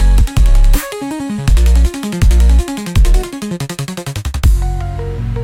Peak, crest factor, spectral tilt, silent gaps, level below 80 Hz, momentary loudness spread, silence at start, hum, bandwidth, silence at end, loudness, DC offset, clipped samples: 0 dBFS; 10 dB; -6 dB/octave; none; -12 dBFS; 10 LU; 0 s; none; 16.5 kHz; 0 s; -15 LUFS; under 0.1%; under 0.1%